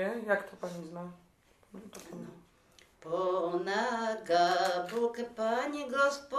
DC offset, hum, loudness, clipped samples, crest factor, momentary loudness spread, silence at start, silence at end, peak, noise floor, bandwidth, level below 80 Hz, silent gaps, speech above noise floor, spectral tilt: under 0.1%; none; -32 LUFS; under 0.1%; 18 dB; 20 LU; 0 s; 0 s; -16 dBFS; -63 dBFS; 15 kHz; -72 dBFS; none; 30 dB; -4 dB/octave